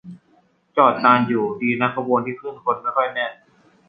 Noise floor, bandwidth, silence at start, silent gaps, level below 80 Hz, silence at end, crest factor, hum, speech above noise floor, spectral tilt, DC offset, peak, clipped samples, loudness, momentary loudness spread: -59 dBFS; 5 kHz; 0.05 s; none; -66 dBFS; 0.55 s; 20 dB; none; 40 dB; -8.5 dB/octave; under 0.1%; -2 dBFS; under 0.1%; -20 LUFS; 11 LU